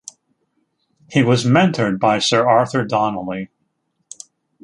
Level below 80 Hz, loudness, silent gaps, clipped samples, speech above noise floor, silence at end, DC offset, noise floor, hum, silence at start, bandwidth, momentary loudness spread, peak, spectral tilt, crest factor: -58 dBFS; -17 LUFS; none; under 0.1%; 53 dB; 1.2 s; under 0.1%; -69 dBFS; none; 1.1 s; 11.5 kHz; 23 LU; 0 dBFS; -5.5 dB/octave; 18 dB